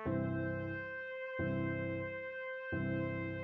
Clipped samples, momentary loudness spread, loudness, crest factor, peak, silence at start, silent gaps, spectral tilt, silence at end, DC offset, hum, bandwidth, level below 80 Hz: under 0.1%; 6 LU; -39 LUFS; 14 dB; -24 dBFS; 0 s; none; -7 dB/octave; 0 s; under 0.1%; none; 5.6 kHz; -62 dBFS